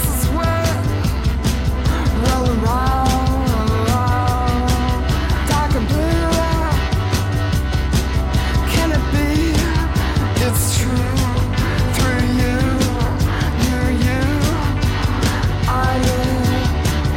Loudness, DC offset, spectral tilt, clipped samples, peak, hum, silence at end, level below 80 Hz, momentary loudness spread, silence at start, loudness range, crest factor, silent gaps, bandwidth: -18 LUFS; under 0.1%; -5.5 dB/octave; under 0.1%; -4 dBFS; none; 0 s; -22 dBFS; 2 LU; 0 s; 1 LU; 12 dB; none; 17 kHz